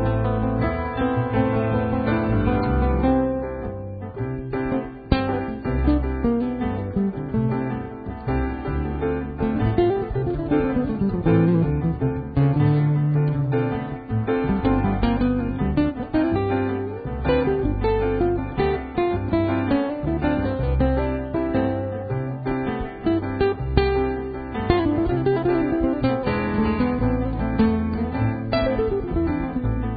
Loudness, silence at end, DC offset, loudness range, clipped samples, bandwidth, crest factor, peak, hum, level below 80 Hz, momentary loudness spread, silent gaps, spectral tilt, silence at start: -23 LUFS; 0 s; under 0.1%; 3 LU; under 0.1%; 5 kHz; 20 dB; -2 dBFS; none; -32 dBFS; 6 LU; none; -12.5 dB/octave; 0 s